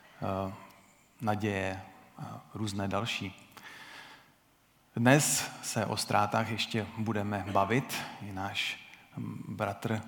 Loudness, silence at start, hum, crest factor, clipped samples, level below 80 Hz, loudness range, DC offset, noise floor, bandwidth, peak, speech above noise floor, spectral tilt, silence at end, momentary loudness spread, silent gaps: -32 LUFS; 0.2 s; none; 26 dB; under 0.1%; -74 dBFS; 7 LU; under 0.1%; -66 dBFS; 19 kHz; -6 dBFS; 34 dB; -4 dB/octave; 0 s; 19 LU; none